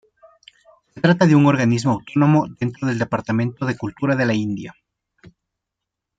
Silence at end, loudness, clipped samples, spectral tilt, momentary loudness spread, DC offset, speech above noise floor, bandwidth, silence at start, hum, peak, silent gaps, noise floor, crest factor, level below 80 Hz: 1.45 s; -19 LUFS; under 0.1%; -7 dB/octave; 11 LU; under 0.1%; 65 dB; 9 kHz; 0.95 s; none; -2 dBFS; none; -83 dBFS; 18 dB; -58 dBFS